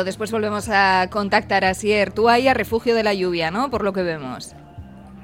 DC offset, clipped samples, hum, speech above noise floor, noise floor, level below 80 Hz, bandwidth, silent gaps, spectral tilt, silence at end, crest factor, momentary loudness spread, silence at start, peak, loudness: under 0.1%; under 0.1%; none; 20 dB; -39 dBFS; -46 dBFS; 16.5 kHz; none; -4.5 dB/octave; 0 s; 16 dB; 9 LU; 0 s; -4 dBFS; -19 LUFS